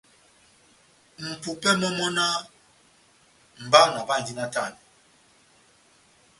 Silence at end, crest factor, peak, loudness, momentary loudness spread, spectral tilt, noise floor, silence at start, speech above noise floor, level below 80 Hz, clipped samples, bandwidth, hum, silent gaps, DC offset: 1.65 s; 28 dB; 0 dBFS; -23 LUFS; 18 LU; -3 dB/octave; -59 dBFS; 1.2 s; 36 dB; -68 dBFS; under 0.1%; 11.5 kHz; none; none; under 0.1%